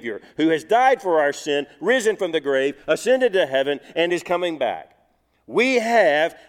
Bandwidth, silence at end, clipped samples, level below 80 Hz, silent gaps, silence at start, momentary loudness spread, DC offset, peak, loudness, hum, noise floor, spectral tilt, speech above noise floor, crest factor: 15 kHz; 0.15 s; under 0.1%; -66 dBFS; none; 0.05 s; 8 LU; under 0.1%; -4 dBFS; -20 LUFS; none; -64 dBFS; -3.5 dB/octave; 43 dB; 16 dB